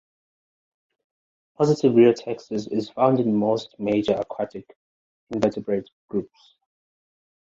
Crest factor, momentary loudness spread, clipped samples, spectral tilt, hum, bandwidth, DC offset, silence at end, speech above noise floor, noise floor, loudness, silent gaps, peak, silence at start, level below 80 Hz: 20 dB; 13 LU; under 0.1%; -7.5 dB/octave; none; 7.8 kHz; under 0.1%; 1.25 s; over 68 dB; under -90 dBFS; -23 LUFS; 4.76-5.27 s, 5.93-6.08 s; -4 dBFS; 1.6 s; -62 dBFS